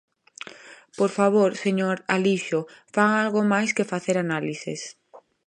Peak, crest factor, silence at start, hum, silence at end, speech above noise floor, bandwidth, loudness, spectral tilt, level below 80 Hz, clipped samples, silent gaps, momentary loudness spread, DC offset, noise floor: -4 dBFS; 20 dB; 0.65 s; none; 0.3 s; 22 dB; 10 kHz; -23 LUFS; -5.5 dB/octave; -72 dBFS; under 0.1%; none; 19 LU; under 0.1%; -45 dBFS